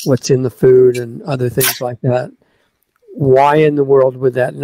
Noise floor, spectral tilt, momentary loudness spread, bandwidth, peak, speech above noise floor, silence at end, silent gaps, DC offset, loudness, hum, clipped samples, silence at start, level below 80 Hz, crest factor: -61 dBFS; -5.5 dB/octave; 10 LU; 16 kHz; 0 dBFS; 48 dB; 0 s; none; under 0.1%; -13 LUFS; none; under 0.1%; 0 s; -52 dBFS; 12 dB